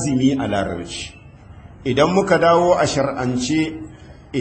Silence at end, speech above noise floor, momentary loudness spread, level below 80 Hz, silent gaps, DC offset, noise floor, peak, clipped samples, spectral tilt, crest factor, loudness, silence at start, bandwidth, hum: 0 s; 23 dB; 15 LU; -44 dBFS; none; under 0.1%; -41 dBFS; -2 dBFS; under 0.1%; -5.5 dB/octave; 16 dB; -18 LUFS; 0 s; 8.8 kHz; none